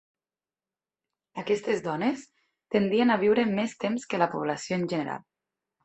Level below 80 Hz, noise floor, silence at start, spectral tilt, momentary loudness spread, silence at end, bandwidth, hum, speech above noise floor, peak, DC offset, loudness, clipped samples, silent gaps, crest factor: -68 dBFS; under -90 dBFS; 1.35 s; -5.5 dB/octave; 13 LU; 0.65 s; 8.4 kHz; none; over 64 dB; -8 dBFS; under 0.1%; -27 LUFS; under 0.1%; none; 20 dB